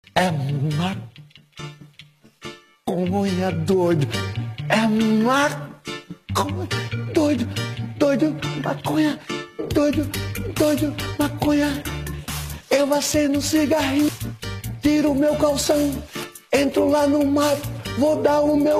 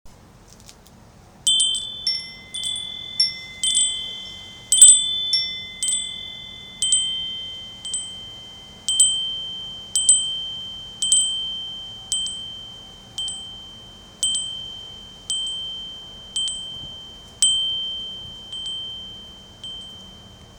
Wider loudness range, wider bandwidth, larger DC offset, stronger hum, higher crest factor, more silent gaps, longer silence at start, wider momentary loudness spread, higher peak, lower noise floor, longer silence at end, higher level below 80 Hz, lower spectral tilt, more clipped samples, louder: second, 4 LU vs 11 LU; second, 15 kHz vs over 20 kHz; neither; neither; second, 16 dB vs 24 dB; neither; about the same, 0.15 s vs 0.05 s; second, 13 LU vs 20 LU; second, -6 dBFS vs 0 dBFS; about the same, -49 dBFS vs -48 dBFS; about the same, 0 s vs 0 s; first, -44 dBFS vs -54 dBFS; first, -5.5 dB/octave vs 2 dB/octave; neither; about the same, -21 LUFS vs -19 LUFS